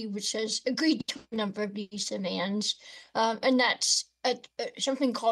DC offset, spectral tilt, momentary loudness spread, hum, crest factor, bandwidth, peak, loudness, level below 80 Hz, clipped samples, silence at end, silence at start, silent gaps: under 0.1%; -2.5 dB/octave; 10 LU; none; 18 dB; 12.5 kHz; -12 dBFS; -29 LUFS; -76 dBFS; under 0.1%; 0 s; 0 s; none